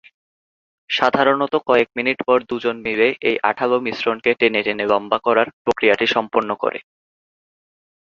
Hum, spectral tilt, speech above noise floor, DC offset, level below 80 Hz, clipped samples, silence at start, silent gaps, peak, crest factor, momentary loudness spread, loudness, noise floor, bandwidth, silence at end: none; -5 dB/octave; over 72 dB; under 0.1%; -60 dBFS; under 0.1%; 0.9 s; 5.53-5.65 s; -2 dBFS; 18 dB; 6 LU; -18 LUFS; under -90 dBFS; 7.2 kHz; 1.2 s